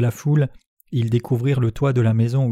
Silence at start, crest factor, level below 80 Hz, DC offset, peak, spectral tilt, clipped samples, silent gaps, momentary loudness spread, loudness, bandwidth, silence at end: 0 s; 12 dB; -48 dBFS; under 0.1%; -6 dBFS; -8.5 dB/octave; under 0.1%; 0.68-0.77 s; 6 LU; -20 LUFS; 13.5 kHz; 0 s